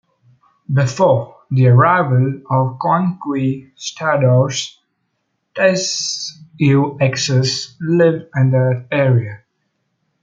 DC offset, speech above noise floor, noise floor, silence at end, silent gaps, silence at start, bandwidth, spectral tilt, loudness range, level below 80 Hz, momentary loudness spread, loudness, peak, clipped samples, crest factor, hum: under 0.1%; 55 dB; -70 dBFS; 0.85 s; none; 0.7 s; 7.6 kHz; -5.5 dB/octave; 3 LU; -58 dBFS; 9 LU; -16 LUFS; -2 dBFS; under 0.1%; 14 dB; none